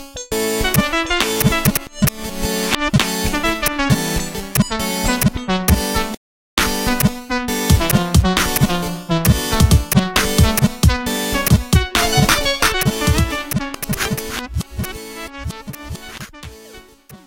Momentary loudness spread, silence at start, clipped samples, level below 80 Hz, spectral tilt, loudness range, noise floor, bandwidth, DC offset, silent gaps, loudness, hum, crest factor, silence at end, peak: 14 LU; 0 s; under 0.1%; -26 dBFS; -4 dB/octave; 6 LU; -42 dBFS; 17.5 kHz; under 0.1%; 6.17-6.57 s; -17 LUFS; none; 18 dB; 0.1 s; 0 dBFS